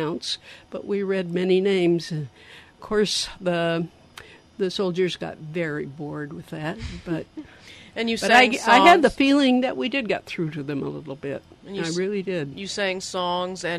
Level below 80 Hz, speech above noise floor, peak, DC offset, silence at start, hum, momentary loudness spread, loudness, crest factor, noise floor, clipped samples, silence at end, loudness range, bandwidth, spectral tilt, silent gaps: -52 dBFS; 23 dB; -2 dBFS; under 0.1%; 0 s; none; 18 LU; -23 LUFS; 20 dB; -46 dBFS; under 0.1%; 0 s; 10 LU; 14.5 kHz; -4.5 dB/octave; none